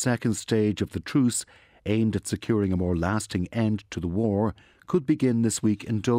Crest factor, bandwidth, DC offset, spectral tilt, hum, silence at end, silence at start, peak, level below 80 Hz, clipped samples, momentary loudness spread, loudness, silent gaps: 14 dB; 16 kHz; under 0.1%; -6 dB/octave; none; 0 s; 0 s; -10 dBFS; -50 dBFS; under 0.1%; 6 LU; -26 LUFS; none